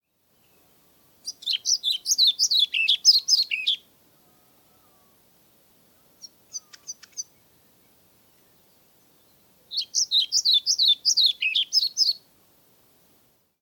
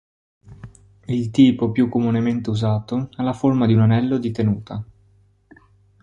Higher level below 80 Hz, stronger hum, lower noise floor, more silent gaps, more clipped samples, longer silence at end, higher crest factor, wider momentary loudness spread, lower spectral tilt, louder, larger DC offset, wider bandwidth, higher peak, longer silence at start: second, -80 dBFS vs -50 dBFS; neither; first, -65 dBFS vs -57 dBFS; neither; neither; first, 1.45 s vs 1.2 s; about the same, 20 dB vs 18 dB; first, 21 LU vs 11 LU; second, 5 dB/octave vs -8.5 dB/octave; about the same, -20 LUFS vs -19 LUFS; neither; first, 19 kHz vs 8.6 kHz; second, -6 dBFS vs -2 dBFS; first, 1.25 s vs 0.5 s